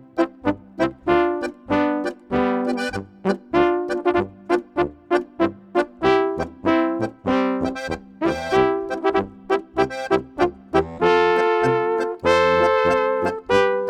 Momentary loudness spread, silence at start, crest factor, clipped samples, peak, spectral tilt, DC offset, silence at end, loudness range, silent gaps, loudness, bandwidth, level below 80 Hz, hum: 8 LU; 0.15 s; 20 dB; under 0.1%; 0 dBFS; -6 dB/octave; under 0.1%; 0 s; 4 LU; none; -21 LUFS; 11 kHz; -48 dBFS; none